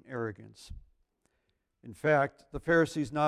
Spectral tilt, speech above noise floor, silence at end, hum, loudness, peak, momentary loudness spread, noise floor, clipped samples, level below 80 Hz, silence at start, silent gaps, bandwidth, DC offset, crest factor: -6.5 dB/octave; 48 dB; 0 s; none; -30 LUFS; -14 dBFS; 23 LU; -78 dBFS; under 0.1%; -56 dBFS; 0.1 s; none; 13 kHz; under 0.1%; 18 dB